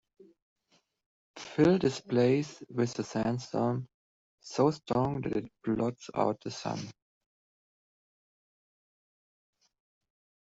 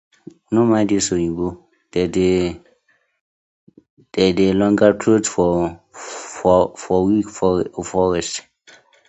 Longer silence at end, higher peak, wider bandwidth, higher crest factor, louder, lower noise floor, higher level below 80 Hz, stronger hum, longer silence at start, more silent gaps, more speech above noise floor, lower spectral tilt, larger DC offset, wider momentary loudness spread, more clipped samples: first, 3.5 s vs 0.7 s; second, -12 dBFS vs 0 dBFS; about the same, 8 kHz vs 8.2 kHz; about the same, 20 dB vs 18 dB; second, -31 LUFS vs -18 LUFS; first, -72 dBFS vs -62 dBFS; second, -64 dBFS vs -44 dBFS; neither; first, 1.35 s vs 0.5 s; second, 3.94-4.38 s vs 3.21-3.67 s, 3.90-3.97 s; about the same, 42 dB vs 44 dB; about the same, -6.5 dB/octave vs -5.5 dB/octave; neither; about the same, 12 LU vs 12 LU; neither